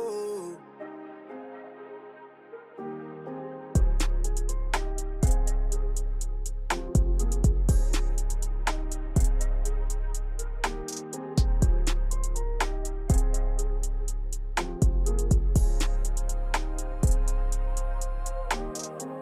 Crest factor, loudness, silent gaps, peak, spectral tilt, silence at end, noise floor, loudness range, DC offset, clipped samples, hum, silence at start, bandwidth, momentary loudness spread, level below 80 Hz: 14 dB; -30 LUFS; none; -12 dBFS; -5 dB/octave; 0 s; -48 dBFS; 5 LU; under 0.1%; under 0.1%; none; 0 s; 14 kHz; 16 LU; -26 dBFS